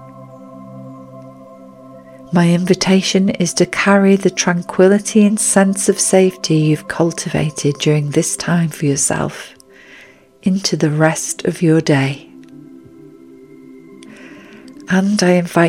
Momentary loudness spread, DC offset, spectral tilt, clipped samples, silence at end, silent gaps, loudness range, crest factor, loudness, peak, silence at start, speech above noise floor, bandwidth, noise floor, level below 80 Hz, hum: 12 LU; under 0.1%; -5 dB/octave; under 0.1%; 0 s; none; 7 LU; 16 dB; -14 LUFS; 0 dBFS; 0 s; 29 dB; 15.5 kHz; -43 dBFS; -52 dBFS; none